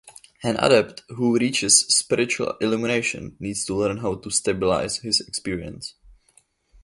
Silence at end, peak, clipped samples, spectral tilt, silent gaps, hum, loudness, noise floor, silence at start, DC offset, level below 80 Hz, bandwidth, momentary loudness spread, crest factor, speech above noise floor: 0.75 s; -2 dBFS; under 0.1%; -2.5 dB/octave; none; none; -21 LUFS; -61 dBFS; 0.05 s; under 0.1%; -52 dBFS; 11.5 kHz; 15 LU; 20 dB; 38 dB